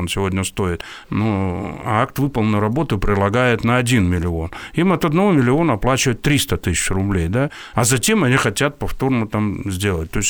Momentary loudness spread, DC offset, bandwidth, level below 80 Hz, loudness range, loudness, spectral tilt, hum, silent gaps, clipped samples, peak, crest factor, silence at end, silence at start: 7 LU; under 0.1%; over 20 kHz; -34 dBFS; 2 LU; -18 LUFS; -5 dB/octave; none; none; under 0.1%; -4 dBFS; 14 dB; 0 s; 0 s